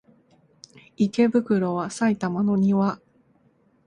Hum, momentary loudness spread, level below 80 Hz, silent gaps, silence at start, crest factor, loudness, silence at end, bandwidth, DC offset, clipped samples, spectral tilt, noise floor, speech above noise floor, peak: none; 6 LU; -64 dBFS; none; 1 s; 16 dB; -23 LUFS; 0.9 s; 10 kHz; under 0.1%; under 0.1%; -7 dB/octave; -62 dBFS; 40 dB; -8 dBFS